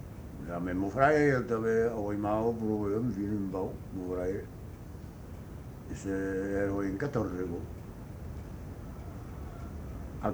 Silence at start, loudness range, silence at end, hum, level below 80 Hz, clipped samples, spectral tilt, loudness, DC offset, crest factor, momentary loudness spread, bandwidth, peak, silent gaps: 0 s; 8 LU; 0 s; none; -48 dBFS; under 0.1%; -7.5 dB/octave; -32 LUFS; under 0.1%; 24 dB; 18 LU; over 20 kHz; -8 dBFS; none